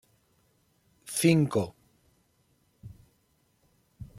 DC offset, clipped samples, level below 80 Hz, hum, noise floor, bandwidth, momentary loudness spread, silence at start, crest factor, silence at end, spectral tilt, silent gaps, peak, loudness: under 0.1%; under 0.1%; -64 dBFS; none; -70 dBFS; 15.5 kHz; 28 LU; 1.05 s; 24 dB; 0.15 s; -5.5 dB/octave; none; -8 dBFS; -27 LUFS